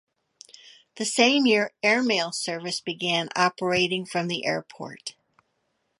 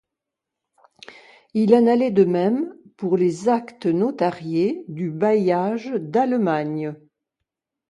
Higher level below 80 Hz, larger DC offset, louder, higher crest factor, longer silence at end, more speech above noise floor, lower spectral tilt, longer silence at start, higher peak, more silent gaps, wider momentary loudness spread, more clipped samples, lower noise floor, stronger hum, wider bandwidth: about the same, -68 dBFS vs -68 dBFS; neither; second, -24 LUFS vs -21 LUFS; about the same, 24 dB vs 20 dB; about the same, 0.9 s vs 0.95 s; second, 50 dB vs 65 dB; second, -3 dB/octave vs -8 dB/octave; second, 0.95 s vs 1.1 s; about the same, -4 dBFS vs -2 dBFS; neither; first, 15 LU vs 11 LU; neither; second, -74 dBFS vs -85 dBFS; neither; about the same, 11.5 kHz vs 11 kHz